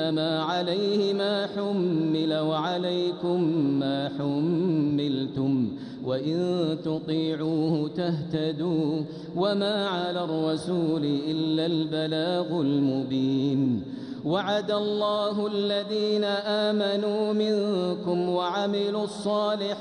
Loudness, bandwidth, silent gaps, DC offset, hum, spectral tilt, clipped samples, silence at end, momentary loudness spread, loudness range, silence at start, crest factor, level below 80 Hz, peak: -26 LUFS; 10.5 kHz; none; under 0.1%; none; -7 dB/octave; under 0.1%; 0 s; 4 LU; 2 LU; 0 s; 12 dB; -68 dBFS; -14 dBFS